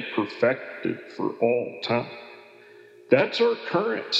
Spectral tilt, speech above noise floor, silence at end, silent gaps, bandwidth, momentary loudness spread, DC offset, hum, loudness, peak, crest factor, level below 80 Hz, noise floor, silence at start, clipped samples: -5.5 dB/octave; 25 dB; 0 s; none; 8 kHz; 10 LU; under 0.1%; none; -25 LUFS; -4 dBFS; 20 dB; -84 dBFS; -50 dBFS; 0 s; under 0.1%